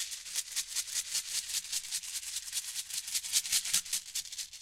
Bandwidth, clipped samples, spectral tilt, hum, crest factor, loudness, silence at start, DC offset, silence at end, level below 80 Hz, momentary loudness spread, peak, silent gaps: 16.5 kHz; under 0.1%; 4 dB/octave; none; 24 dB; -33 LUFS; 0 s; under 0.1%; 0 s; -70 dBFS; 8 LU; -12 dBFS; none